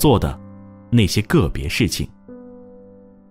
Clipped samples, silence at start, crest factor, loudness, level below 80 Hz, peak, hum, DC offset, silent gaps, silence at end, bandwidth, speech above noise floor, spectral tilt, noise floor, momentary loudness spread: under 0.1%; 0 s; 18 dB; -19 LUFS; -32 dBFS; -2 dBFS; none; under 0.1%; none; 0.55 s; 16 kHz; 28 dB; -5.5 dB/octave; -45 dBFS; 24 LU